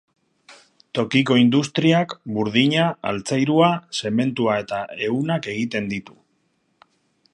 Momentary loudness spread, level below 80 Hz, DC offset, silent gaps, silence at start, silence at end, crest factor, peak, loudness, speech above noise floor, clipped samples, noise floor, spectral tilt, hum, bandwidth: 10 LU; -62 dBFS; under 0.1%; none; 0.5 s; 1.3 s; 18 dB; -4 dBFS; -21 LUFS; 47 dB; under 0.1%; -67 dBFS; -5.5 dB/octave; none; 11 kHz